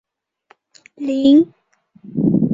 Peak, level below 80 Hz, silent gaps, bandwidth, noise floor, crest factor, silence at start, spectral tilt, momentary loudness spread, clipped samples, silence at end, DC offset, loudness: -2 dBFS; -54 dBFS; none; 7.6 kHz; -56 dBFS; 16 dB; 1 s; -8.5 dB/octave; 15 LU; under 0.1%; 0 s; under 0.1%; -16 LUFS